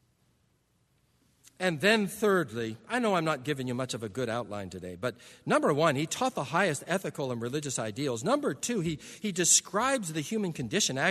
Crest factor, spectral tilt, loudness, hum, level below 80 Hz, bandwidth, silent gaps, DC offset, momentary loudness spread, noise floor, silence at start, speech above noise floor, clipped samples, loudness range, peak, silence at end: 22 dB; -3.5 dB/octave; -29 LUFS; none; -66 dBFS; 13.5 kHz; none; under 0.1%; 11 LU; -71 dBFS; 1.6 s; 41 dB; under 0.1%; 3 LU; -8 dBFS; 0 s